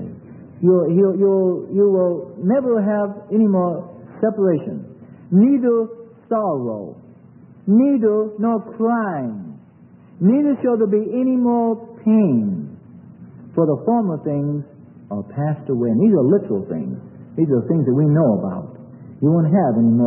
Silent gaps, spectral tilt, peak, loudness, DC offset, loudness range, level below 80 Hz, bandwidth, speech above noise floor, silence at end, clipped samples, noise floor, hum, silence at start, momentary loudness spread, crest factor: none; -15 dB/octave; -4 dBFS; -18 LUFS; under 0.1%; 3 LU; -64 dBFS; 3 kHz; 29 dB; 0 s; under 0.1%; -46 dBFS; none; 0 s; 15 LU; 14 dB